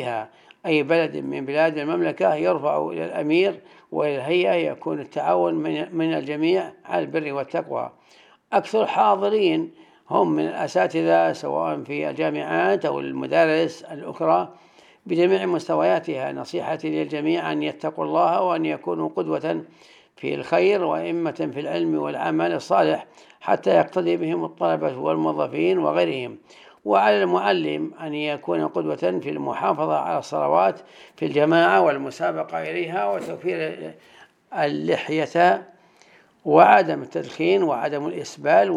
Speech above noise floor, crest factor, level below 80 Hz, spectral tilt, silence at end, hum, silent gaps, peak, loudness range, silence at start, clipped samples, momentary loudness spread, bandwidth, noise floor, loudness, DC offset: 33 dB; 22 dB; -78 dBFS; -6 dB/octave; 0 s; none; none; -2 dBFS; 4 LU; 0 s; under 0.1%; 10 LU; 10.5 kHz; -55 dBFS; -22 LUFS; under 0.1%